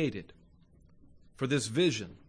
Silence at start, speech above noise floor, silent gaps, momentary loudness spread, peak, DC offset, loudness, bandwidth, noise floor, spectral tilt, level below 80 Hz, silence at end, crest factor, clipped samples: 0 s; 29 dB; none; 11 LU; -16 dBFS; under 0.1%; -31 LUFS; 10.5 kHz; -60 dBFS; -5 dB/octave; -62 dBFS; 0.1 s; 16 dB; under 0.1%